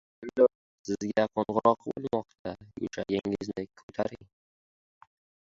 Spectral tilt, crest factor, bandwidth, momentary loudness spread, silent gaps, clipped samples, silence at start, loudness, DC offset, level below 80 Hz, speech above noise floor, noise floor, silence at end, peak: -6 dB/octave; 24 dB; 7.6 kHz; 14 LU; 0.55-0.84 s, 2.39-2.45 s, 3.83-3.88 s; under 0.1%; 0.2 s; -30 LUFS; under 0.1%; -64 dBFS; over 61 dB; under -90 dBFS; 1.2 s; -8 dBFS